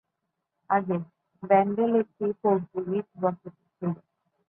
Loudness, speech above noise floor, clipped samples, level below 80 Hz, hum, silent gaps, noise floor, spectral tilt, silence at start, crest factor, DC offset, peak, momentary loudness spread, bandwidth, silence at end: -27 LUFS; 56 dB; under 0.1%; -72 dBFS; none; none; -82 dBFS; -12 dB/octave; 0.7 s; 20 dB; under 0.1%; -8 dBFS; 15 LU; 3.5 kHz; 0.55 s